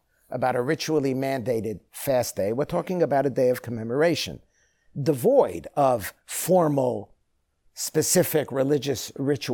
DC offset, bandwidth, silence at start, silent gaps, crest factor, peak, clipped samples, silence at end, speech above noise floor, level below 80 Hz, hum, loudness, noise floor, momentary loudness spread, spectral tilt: under 0.1%; 19.5 kHz; 0.3 s; none; 18 dB; -8 dBFS; under 0.1%; 0 s; 47 dB; -60 dBFS; none; -24 LUFS; -71 dBFS; 10 LU; -5 dB/octave